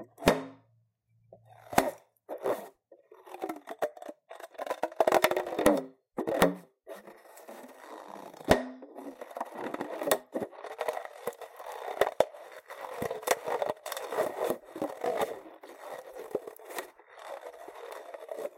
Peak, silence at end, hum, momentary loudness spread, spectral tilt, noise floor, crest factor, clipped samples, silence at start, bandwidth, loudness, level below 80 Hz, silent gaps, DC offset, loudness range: -6 dBFS; 0.1 s; none; 21 LU; -4 dB/octave; -70 dBFS; 28 dB; under 0.1%; 0 s; 17 kHz; -32 LUFS; -58 dBFS; none; under 0.1%; 7 LU